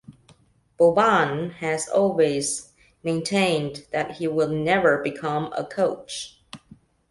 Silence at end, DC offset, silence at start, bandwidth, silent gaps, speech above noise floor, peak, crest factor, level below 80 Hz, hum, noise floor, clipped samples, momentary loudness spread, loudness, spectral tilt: 0.55 s; under 0.1%; 0.1 s; 11.5 kHz; none; 35 dB; -6 dBFS; 18 dB; -60 dBFS; none; -57 dBFS; under 0.1%; 11 LU; -23 LUFS; -4.5 dB/octave